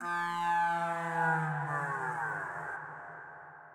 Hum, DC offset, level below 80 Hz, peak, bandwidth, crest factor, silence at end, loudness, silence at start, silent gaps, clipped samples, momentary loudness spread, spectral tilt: none; under 0.1%; -82 dBFS; -20 dBFS; 15.5 kHz; 14 dB; 0 s; -33 LUFS; 0 s; none; under 0.1%; 16 LU; -5.5 dB/octave